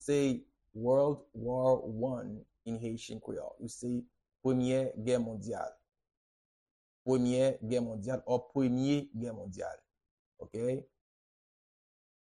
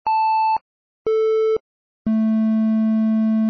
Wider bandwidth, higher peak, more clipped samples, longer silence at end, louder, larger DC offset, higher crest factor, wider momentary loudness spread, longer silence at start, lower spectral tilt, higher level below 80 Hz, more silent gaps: first, 11.5 kHz vs 5.2 kHz; second, -18 dBFS vs -12 dBFS; neither; first, 1.5 s vs 0 s; second, -34 LUFS vs -20 LUFS; neither; first, 18 dB vs 6 dB; first, 13 LU vs 7 LU; about the same, 0 s vs 0.05 s; second, -7 dB/octave vs -9 dB/octave; second, -66 dBFS vs -60 dBFS; first, 6.17-7.05 s, 10.11-10.32 s vs 0.61-1.05 s, 1.60-2.05 s